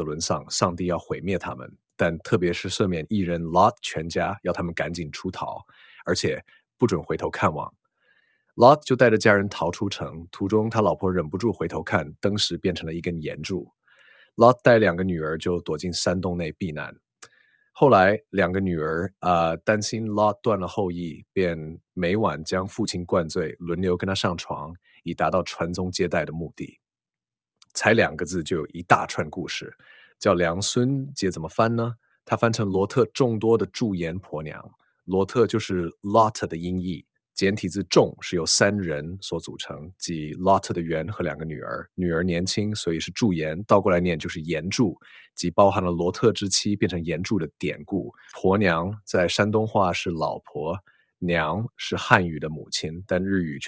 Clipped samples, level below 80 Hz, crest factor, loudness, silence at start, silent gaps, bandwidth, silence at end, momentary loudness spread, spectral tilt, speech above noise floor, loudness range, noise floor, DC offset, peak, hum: under 0.1%; -48 dBFS; 24 dB; -24 LUFS; 0 s; none; 8 kHz; 0 s; 13 LU; -5 dB/octave; over 66 dB; 5 LU; under -90 dBFS; under 0.1%; 0 dBFS; none